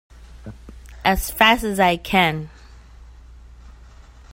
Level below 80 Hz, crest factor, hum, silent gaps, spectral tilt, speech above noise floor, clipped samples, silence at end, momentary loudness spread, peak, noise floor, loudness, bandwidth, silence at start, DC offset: -38 dBFS; 22 dB; none; none; -4 dB/octave; 26 dB; under 0.1%; 0.6 s; 25 LU; 0 dBFS; -44 dBFS; -18 LUFS; 16.5 kHz; 0.2 s; under 0.1%